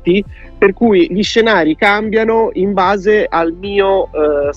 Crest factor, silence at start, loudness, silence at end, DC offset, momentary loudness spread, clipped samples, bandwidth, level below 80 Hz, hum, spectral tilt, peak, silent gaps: 12 dB; 0.05 s; -13 LUFS; 0 s; under 0.1%; 5 LU; under 0.1%; 8.2 kHz; -36 dBFS; none; -5.5 dB/octave; 0 dBFS; none